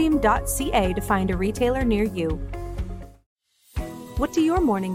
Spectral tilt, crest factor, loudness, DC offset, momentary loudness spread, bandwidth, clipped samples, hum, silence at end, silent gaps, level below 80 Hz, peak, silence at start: -5.5 dB/octave; 16 dB; -24 LUFS; under 0.1%; 13 LU; 16.5 kHz; under 0.1%; none; 0 s; 3.26-3.36 s; -34 dBFS; -8 dBFS; 0 s